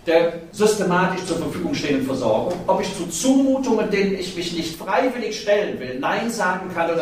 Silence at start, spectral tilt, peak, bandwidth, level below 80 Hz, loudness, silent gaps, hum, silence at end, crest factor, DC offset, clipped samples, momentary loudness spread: 0.05 s; -4.5 dB/octave; -4 dBFS; 15.5 kHz; -50 dBFS; -21 LUFS; none; none; 0 s; 16 dB; under 0.1%; under 0.1%; 7 LU